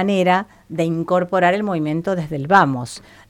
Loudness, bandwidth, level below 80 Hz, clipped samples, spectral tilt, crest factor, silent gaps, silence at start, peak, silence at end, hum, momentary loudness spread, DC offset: -18 LUFS; 13.5 kHz; -56 dBFS; under 0.1%; -6.5 dB/octave; 18 dB; none; 0 s; -2 dBFS; 0.3 s; none; 10 LU; under 0.1%